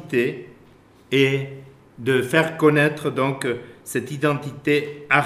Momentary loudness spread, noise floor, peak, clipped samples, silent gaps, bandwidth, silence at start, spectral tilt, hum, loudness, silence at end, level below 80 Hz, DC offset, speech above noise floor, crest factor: 12 LU; -51 dBFS; 0 dBFS; under 0.1%; none; 15.5 kHz; 0 s; -5.5 dB/octave; none; -21 LUFS; 0 s; -62 dBFS; under 0.1%; 30 dB; 22 dB